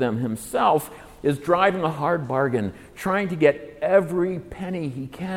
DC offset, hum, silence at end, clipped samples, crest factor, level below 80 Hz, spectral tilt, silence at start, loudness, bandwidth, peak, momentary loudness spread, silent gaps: under 0.1%; none; 0 s; under 0.1%; 18 dB; -54 dBFS; -6.5 dB/octave; 0 s; -23 LUFS; 17 kHz; -4 dBFS; 11 LU; none